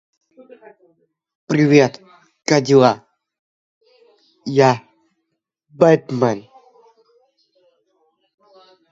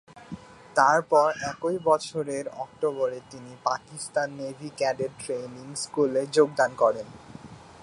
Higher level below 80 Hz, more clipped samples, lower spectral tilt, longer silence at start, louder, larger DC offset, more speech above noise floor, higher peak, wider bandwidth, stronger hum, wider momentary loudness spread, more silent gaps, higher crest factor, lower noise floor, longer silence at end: about the same, -64 dBFS vs -66 dBFS; neither; first, -6 dB/octave vs -4 dB/octave; first, 1.5 s vs 0.15 s; first, -16 LUFS vs -26 LUFS; neither; first, 61 dB vs 20 dB; first, 0 dBFS vs -6 dBFS; second, 7.8 kHz vs 11.5 kHz; neither; second, 15 LU vs 22 LU; first, 3.39-3.81 s vs none; about the same, 20 dB vs 22 dB; first, -76 dBFS vs -46 dBFS; first, 2.5 s vs 0 s